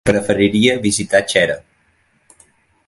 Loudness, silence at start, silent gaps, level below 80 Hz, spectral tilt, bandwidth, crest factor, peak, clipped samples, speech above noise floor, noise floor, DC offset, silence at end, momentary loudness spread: -15 LUFS; 0.05 s; none; -46 dBFS; -4 dB/octave; 11.5 kHz; 18 dB; 0 dBFS; under 0.1%; 44 dB; -59 dBFS; under 0.1%; 1.3 s; 5 LU